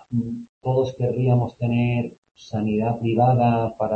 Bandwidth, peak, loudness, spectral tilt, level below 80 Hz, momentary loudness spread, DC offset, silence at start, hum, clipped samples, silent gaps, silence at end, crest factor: 6.6 kHz; -6 dBFS; -22 LUFS; -9.5 dB/octave; -52 dBFS; 10 LU; under 0.1%; 0.1 s; none; under 0.1%; 0.49-0.61 s, 2.18-2.22 s, 2.31-2.35 s; 0 s; 16 dB